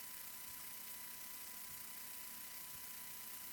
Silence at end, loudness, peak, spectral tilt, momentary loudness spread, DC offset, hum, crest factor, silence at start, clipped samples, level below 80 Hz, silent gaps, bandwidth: 0 s; -48 LUFS; -34 dBFS; 0 dB/octave; 0 LU; under 0.1%; none; 18 dB; 0 s; under 0.1%; -80 dBFS; none; 19 kHz